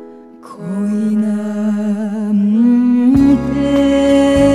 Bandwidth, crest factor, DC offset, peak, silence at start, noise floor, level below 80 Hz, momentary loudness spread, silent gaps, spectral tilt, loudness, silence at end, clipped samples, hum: 11 kHz; 12 dB; 0.3%; -2 dBFS; 0 s; -36 dBFS; -36 dBFS; 8 LU; none; -7 dB/octave; -13 LUFS; 0 s; under 0.1%; none